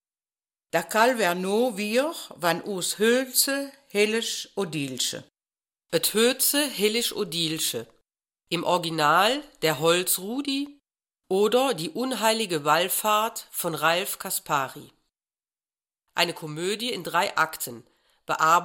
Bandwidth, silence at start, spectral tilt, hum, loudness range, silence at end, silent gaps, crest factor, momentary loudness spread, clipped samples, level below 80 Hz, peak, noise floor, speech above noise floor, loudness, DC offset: 17 kHz; 0.75 s; -2.5 dB/octave; none; 4 LU; 0 s; none; 20 dB; 9 LU; under 0.1%; -70 dBFS; -6 dBFS; under -90 dBFS; over 65 dB; -25 LUFS; under 0.1%